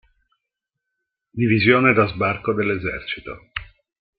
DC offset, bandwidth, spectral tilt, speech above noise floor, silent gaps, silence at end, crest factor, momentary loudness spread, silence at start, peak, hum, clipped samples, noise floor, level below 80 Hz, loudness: under 0.1%; 5.2 kHz; -11 dB/octave; 63 dB; none; 0.55 s; 20 dB; 18 LU; 1.35 s; -2 dBFS; none; under 0.1%; -82 dBFS; -50 dBFS; -19 LUFS